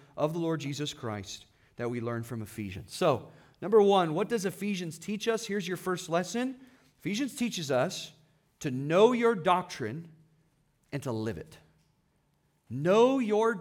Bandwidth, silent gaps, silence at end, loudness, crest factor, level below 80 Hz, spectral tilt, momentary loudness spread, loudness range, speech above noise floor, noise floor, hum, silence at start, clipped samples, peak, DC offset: 17.5 kHz; none; 0 s; -30 LUFS; 22 dB; -70 dBFS; -5.5 dB/octave; 16 LU; 6 LU; 43 dB; -72 dBFS; none; 0.15 s; under 0.1%; -10 dBFS; under 0.1%